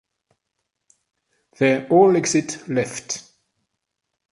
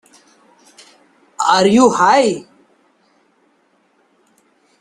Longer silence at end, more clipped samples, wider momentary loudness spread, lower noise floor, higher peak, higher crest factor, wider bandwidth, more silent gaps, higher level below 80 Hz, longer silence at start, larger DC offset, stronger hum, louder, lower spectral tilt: second, 1.1 s vs 2.4 s; neither; first, 14 LU vs 9 LU; first, -79 dBFS vs -59 dBFS; about the same, -2 dBFS vs 0 dBFS; about the same, 20 dB vs 18 dB; about the same, 11.5 kHz vs 12 kHz; neither; about the same, -64 dBFS vs -60 dBFS; first, 1.6 s vs 1.4 s; neither; neither; second, -20 LUFS vs -13 LUFS; about the same, -4.5 dB/octave vs -4 dB/octave